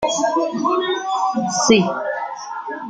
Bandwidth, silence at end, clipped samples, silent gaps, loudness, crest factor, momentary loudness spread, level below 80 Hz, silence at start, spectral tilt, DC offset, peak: 9.6 kHz; 0 s; under 0.1%; none; -19 LUFS; 18 dB; 13 LU; -56 dBFS; 0 s; -3.5 dB/octave; under 0.1%; -2 dBFS